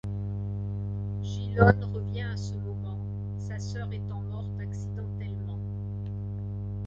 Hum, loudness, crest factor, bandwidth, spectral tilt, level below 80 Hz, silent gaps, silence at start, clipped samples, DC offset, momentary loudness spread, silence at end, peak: 50 Hz at -35 dBFS; -32 LUFS; 26 dB; 7.6 kHz; -8 dB/octave; -44 dBFS; none; 0.05 s; under 0.1%; under 0.1%; 12 LU; 0 s; -4 dBFS